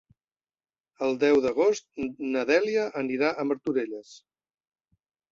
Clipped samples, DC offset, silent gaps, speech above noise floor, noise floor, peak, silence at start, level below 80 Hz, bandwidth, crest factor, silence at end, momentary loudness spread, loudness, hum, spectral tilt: under 0.1%; under 0.1%; none; over 64 dB; under -90 dBFS; -10 dBFS; 1 s; -68 dBFS; 7.6 kHz; 18 dB; 1.15 s; 10 LU; -26 LUFS; none; -4.5 dB/octave